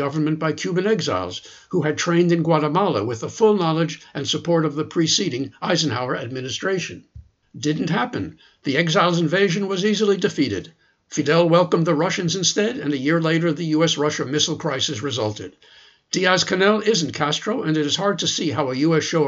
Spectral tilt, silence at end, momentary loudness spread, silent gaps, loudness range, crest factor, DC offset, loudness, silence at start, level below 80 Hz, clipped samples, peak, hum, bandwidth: -4.5 dB/octave; 0 s; 9 LU; none; 4 LU; 18 dB; under 0.1%; -20 LUFS; 0 s; -60 dBFS; under 0.1%; -2 dBFS; none; 8 kHz